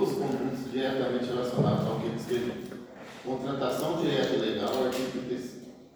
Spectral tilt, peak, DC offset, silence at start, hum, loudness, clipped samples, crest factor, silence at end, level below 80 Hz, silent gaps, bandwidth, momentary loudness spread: -6 dB/octave; -12 dBFS; under 0.1%; 0 s; none; -30 LUFS; under 0.1%; 16 dB; 0.1 s; -62 dBFS; none; over 20 kHz; 14 LU